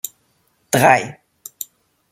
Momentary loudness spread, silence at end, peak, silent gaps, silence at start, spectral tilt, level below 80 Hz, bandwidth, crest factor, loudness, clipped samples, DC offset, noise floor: 23 LU; 1 s; -2 dBFS; none; 0.75 s; -4 dB/octave; -60 dBFS; 16.5 kHz; 20 dB; -15 LUFS; under 0.1%; under 0.1%; -63 dBFS